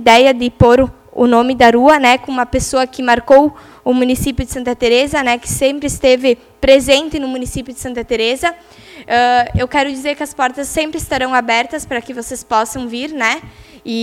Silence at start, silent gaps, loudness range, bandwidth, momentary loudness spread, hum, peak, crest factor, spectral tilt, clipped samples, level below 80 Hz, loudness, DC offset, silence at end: 0 s; none; 6 LU; 16 kHz; 13 LU; none; 0 dBFS; 14 dB; -4 dB/octave; 0.3%; -34 dBFS; -14 LUFS; under 0.1%; 0 s